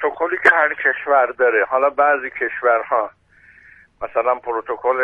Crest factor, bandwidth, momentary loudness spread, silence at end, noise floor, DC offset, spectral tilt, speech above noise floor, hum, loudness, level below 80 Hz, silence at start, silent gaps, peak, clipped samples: 18 dB; 9.6 kHz; 9 LU; 0 s; -49 dBFS; under 0.1%; -4.5 dB/octave; 31 dB; none; -17 LUFS; -60 dBFS; 0 s; none; 0 dBFS; under 0.1%